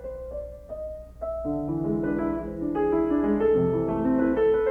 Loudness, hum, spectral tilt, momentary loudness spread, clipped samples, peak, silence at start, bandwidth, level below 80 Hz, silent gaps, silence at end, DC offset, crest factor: -25 LUFS; none; -10 dB/octave; 14 LU; under 0.1%; -12 dBFS; 0 s; 3.3 kHz; -44 dBFS; none; 0 s; under 0.1%; 14 dB